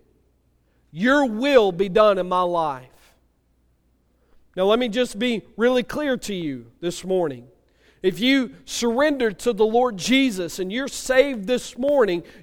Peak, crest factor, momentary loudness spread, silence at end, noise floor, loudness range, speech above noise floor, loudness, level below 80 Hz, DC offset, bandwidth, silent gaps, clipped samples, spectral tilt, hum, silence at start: -2 dBFS; 20 dB; 11 LU; 0.2 s; -63 dBFS; 4 LU; 43 dB; -21 LUFS; -52 dBFS; under 0.1%; 17 kHz; none; under 0.1%; -4 dB/octave; none; 0.95 s